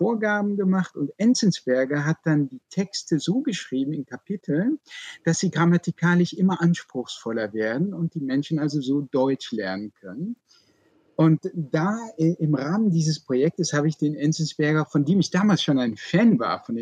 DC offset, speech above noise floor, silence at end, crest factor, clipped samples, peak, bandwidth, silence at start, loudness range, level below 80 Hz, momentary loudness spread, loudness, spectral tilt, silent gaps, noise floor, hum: under 0.1%; 39 dB; 0 s; 14 dB; under 0.1%; -8 dBFS; 9.4 kHz; 0 s; 4 LU; -70 dBFS; 9 LU; -23 LUFS; -6 dB/octave; none; -62 dBFS; none